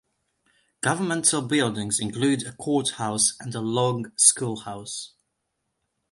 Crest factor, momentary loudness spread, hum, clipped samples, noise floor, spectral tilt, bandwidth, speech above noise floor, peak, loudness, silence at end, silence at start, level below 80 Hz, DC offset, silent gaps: 24 dB; 16 LU; none; under 0.1%; -78 dBFS; -3 dB/octave; 11.5 kHz; 54 dB; -2 dBFS; -23 LUFS; 1.05 s; 0.85 s; -64 dBFS; under 0.1%; none